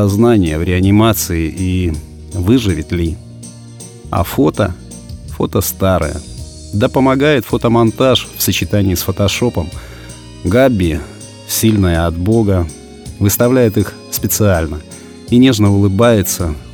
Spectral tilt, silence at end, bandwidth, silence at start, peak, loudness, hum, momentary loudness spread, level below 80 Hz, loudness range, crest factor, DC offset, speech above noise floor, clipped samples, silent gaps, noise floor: -5.5 dB/octave; 0 s; 19.5 kHz; 0 s; 0 dBFS; -14 LUFS; none; 20 LU; -30 dBFS; 4 LU; 14 dB; under 0.1%; 20 dB; under 0.1%; none; -33 dBFS